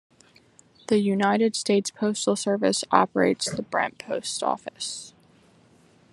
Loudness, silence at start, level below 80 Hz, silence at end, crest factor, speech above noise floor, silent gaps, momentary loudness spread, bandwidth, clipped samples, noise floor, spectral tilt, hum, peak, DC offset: -24 LUFS; 0.9 s; -70 dBFS; 1.05 s; 24 dB; 33 dB; none; 11 LU; 12 kHz; under 0.1%; -57 dBFS; -4 dB/octave; none; -2 dBFS; under 0.1%